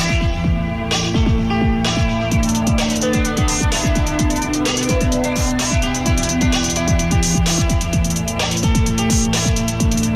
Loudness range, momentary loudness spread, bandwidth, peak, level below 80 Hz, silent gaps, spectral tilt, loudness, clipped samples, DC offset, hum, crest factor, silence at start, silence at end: 1 LU; 2 LU; 15 kHz; -4 dBFS; -22 dBFS; none; -4.5 dB/octave; -17 LUFS; under 0.1%; under 0.1%; none; 12 dB; 0 s; 0 s